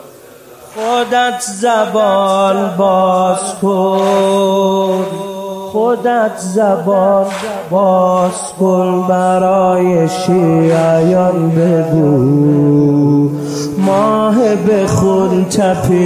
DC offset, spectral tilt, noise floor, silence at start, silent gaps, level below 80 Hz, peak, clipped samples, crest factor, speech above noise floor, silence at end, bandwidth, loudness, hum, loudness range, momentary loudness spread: under 0.1%; -6.5 dB/octave; -37 dBFS; 0 s; none; -46 dBFS; -2 dBFS; under 0.1%; 10 dB; 26 dB; 0 s; 15.5 kHz; -12 LUFS; none; 3 LU; 6 LU